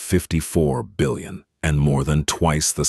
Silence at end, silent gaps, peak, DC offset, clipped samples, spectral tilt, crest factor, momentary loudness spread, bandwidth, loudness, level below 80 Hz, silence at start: 0 s; none; -4 dBFS; under 0.1%; under 0.1%; -5 dB/octave; 16 dB; 6 LU; 12.5 kHz; -21 LUFS; -32 dBFS; 0 s